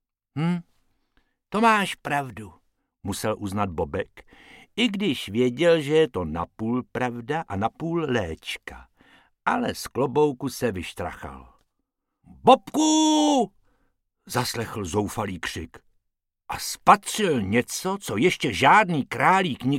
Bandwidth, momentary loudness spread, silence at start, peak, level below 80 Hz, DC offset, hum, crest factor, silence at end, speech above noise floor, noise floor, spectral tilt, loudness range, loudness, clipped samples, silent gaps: 16.5 kHz; 15 LU; 0.35 s; -2 dBFS; -52 dBFS; under 0.1%; none; 22 dB; 0 s; 56 dB; -79 dBFS; -4.5 dB/octave; 7 LU; -24 LUFS; under 0.1%; none